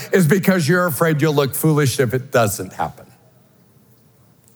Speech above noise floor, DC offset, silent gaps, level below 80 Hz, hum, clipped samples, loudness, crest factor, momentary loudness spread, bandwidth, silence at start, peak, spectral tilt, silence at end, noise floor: 36 dB; under 0.1%; none; -62 dBFS; none; under 0.1%; -17 LUFS; 18 dB; 9 LU; over 20 kHz; 0 s; 0 dBFS; -5.5 dB/octave; 1.55 s; -52 dBFS